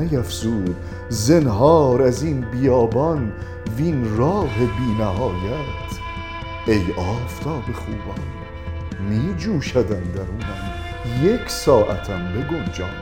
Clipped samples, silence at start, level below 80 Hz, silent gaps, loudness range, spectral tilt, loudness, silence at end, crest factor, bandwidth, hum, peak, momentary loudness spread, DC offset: under 0.1%; 0 s; -34 dBFS; none; 7 LU; -6.5 dB/octave; -21 LUFS; 0 s; 20 dB; 17.5 kHz; none; -2 dBFS; 13 LU; under 0.1%